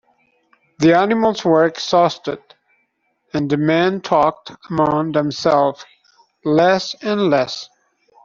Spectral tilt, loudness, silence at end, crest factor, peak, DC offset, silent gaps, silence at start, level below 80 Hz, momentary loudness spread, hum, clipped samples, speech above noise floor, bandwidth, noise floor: -6 dB/octave; -17 LUFS; 0.6 s; 16 dB; -2 dBFS; under 0.1%; none; 0.8 s; -56 dBFS; 13 LU; none; under 0.1%; 50 dB; 7.4 kHz; -67 dBFS